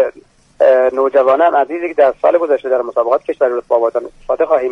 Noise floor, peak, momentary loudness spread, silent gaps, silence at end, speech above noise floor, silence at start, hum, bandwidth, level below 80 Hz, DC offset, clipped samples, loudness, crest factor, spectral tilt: -45 dBFS; 0 dBFS; 7 LU; none; 0 s; 31 dB; 0 s; none; 6.2 kHz; -52 dBFS; under 0.1%; under 0.1%; -14 LUFS; 12 dB; -5.5 dB/octave